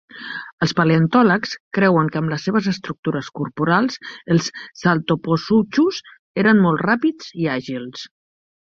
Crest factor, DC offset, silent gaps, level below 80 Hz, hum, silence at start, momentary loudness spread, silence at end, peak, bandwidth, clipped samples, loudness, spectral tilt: 18 dB; under 0.1%; 0.52-0.58 s, 1.60-1.71 s, 2.99-3.03 s, 6.19-6.34 s; -58 dBFS; none; 0.15 s; 14 LU; 0.55 s; -2 dBFS; 7.4 kHz; under 0.1%; -19 LUFS; -6.5 dB/octave